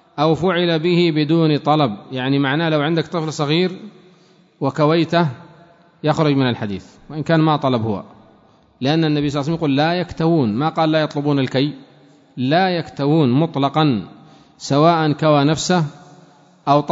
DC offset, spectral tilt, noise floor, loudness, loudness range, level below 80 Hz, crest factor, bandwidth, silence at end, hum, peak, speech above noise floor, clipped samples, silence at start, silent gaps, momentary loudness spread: under 0.1%; -6.5 dB/octave; -52 dBFS; -18 LUFS; 3 LU; -54 dBFS; 16 dB; 8 kHz; 0 s; none; -2 dBFS; 35 dB; under 0.1%; 0.15 s; none; 9 LU